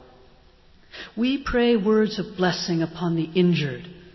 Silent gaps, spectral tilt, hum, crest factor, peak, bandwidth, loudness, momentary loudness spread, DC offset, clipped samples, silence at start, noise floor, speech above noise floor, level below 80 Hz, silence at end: none; -6.5 dB/octave; none; 16 dB; -8 dBFS; 6.2 kHz; -23 LUFS; 16 LU; under 0.1%; under 0.1%; 0.95 s; -53 dBFS; 31 dB; -48 dBFS; 0.05 s